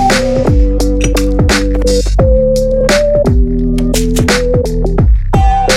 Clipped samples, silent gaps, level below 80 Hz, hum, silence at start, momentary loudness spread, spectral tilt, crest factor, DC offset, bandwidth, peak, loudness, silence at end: under 0.1%; none; -14 dBFS; none; 0 s; 3 LU; -5.5 dB/octave; 10 dB; under 0.1%; 15 kHz; 0 dBFS; -11 LUFS; 0 s